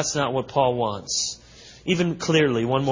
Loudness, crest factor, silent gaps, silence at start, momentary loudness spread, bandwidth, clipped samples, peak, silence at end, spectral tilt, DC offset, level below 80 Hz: -23 LUFS; 18 dB; none; 0 s; 8 LU; 7.6 kHz; under 0.1%; -6 dBFS; 0 s; -4 dB/octave; under 0.1%; -54 dBFS